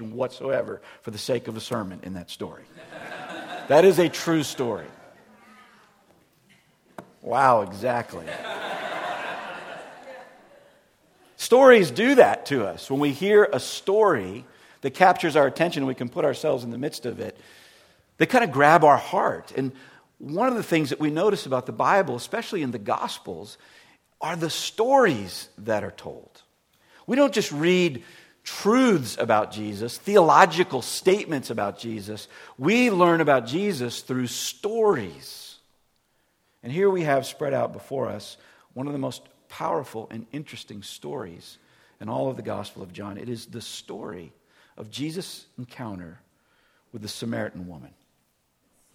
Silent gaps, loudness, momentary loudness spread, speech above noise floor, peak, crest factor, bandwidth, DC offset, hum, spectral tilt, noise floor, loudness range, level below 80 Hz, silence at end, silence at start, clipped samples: none; -23 LUFS; 20 LU; 46 dB; 0 dBFS; 24 dB; 16.5 kHz; under 0.1%; none; -5 dB/octave; -70 dBFS; 14 LU; -68 dBFS; 1.1 s; 0 s; under 0.1%